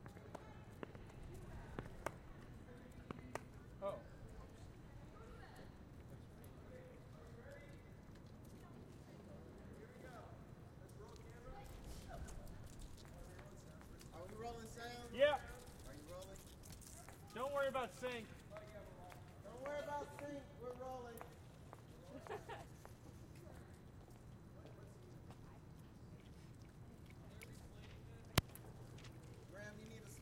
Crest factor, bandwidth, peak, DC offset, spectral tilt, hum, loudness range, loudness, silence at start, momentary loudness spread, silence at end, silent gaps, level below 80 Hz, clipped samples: 40 dB; 16 kHz; -10 dBFS; under 0.1%; -5 dB/octave; none; 13 LU; -51 LUFS; 0 s; 13 LU; 0 s; none; -62 dBFS; under 0.1%